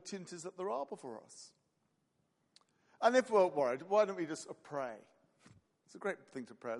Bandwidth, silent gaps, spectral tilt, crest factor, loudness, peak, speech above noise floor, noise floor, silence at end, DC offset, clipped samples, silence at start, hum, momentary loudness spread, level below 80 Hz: 11.5 kHz; none; -4.5 dB/octave; 22 dB; -36 LUFS; -16 dBFS; 44 dB; -80 dBFS; 0 s; under 0.1%; under 0.1%; 0.05 s; none; 19 LU; -90 dBFS